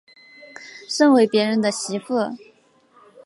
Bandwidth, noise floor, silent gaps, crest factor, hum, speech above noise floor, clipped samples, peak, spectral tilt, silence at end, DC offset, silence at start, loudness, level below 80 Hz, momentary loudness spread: 11.5 kHz; -56 dBFS; none; 16 dB; none; 38 dB; under 0.1%; -4 dBFS; -4 dB/octave; 0.9 s; under 0.1%; 0.6 s; -19 LUFS; -76 dBFS; 24 LU